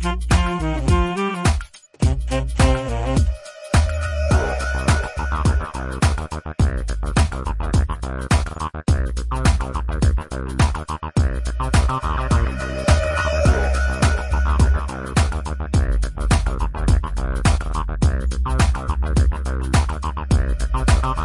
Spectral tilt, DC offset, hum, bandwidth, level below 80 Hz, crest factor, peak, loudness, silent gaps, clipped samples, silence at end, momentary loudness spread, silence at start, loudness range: -5.5 dB/octave; 0.2%; none; 11.5 kHz; -22 dBFS; 16 dB; -2 dBFS; -21 LUFS; none; under 0.1%; 0 s; 7 LU; 0 s; 2 LU